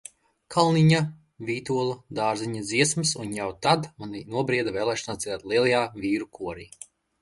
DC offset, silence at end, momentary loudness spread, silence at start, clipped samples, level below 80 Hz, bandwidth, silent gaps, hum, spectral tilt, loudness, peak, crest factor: under 0.1%; 0.55 s; 15 LU; 0.5 s; under 0.1%; -60 dBFS; 11.5 kHz; none; none; -4.5 dB/octave; -25 LUFS; -6 dBFS; 20 dB